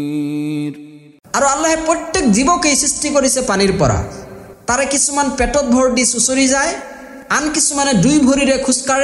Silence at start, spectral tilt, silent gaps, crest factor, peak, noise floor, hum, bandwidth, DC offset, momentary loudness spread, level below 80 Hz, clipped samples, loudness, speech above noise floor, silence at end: 0 s; -3.5 dB/octave; none; 12 dB; -2 dBFS; -35 dBFS; none; 12.5 kHz; under 0.1%; 10 LU; -36 dBFS; under 0.1%; -14 LUFS; 21 dB; 0 s